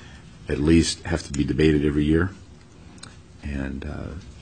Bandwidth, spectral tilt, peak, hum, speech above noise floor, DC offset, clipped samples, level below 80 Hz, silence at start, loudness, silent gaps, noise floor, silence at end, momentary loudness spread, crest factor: 9.6 kHz; -6 dB/octave; -6 dBFS; none; 24 dB; under 0.1%; under 0.1%; -36 dBFS; 0 s; -23 LUFS; none; -46 dBFS; 0 s; 22 LU; 18 dB